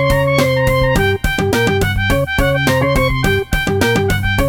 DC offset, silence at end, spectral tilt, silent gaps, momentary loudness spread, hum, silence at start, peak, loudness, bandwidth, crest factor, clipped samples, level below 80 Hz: under 0.1%; 0 s; -5.5 dB/octave; none; 2 LU; none; 0 s; 0 dBFS; -14 LUFS; 18.5 kHz; 14 dB; under 0.1%; -24 dBFS